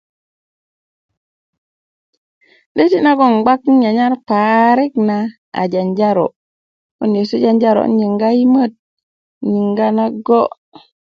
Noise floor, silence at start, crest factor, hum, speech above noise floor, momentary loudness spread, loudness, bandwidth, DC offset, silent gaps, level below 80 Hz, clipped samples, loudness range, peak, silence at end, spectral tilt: under -90 dBFS; 2.75 s; 16 dB; none; over 77 dB; 9 LU; -14 LUFS; 6.6 kHz; under 0.1%; 5.38-5.52 s, 6.36-6.99 s, 8.79-8.97 s, 9.03-9.41 s; -64 dBFS; under 0.1%; 3 LU; 0 dBFS; 0.65 s; -8 dB/octave